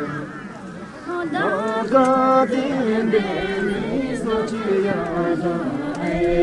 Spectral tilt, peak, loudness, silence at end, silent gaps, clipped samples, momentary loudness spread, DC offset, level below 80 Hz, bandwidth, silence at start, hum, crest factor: -6.5 dB/octave; -2 dBFS; -21 LUFS; 0 s; none; under 0.1%; 14 LU; under 0.1%; -44 dBFS; 11.5 kHz; 0 s; none; 18 dB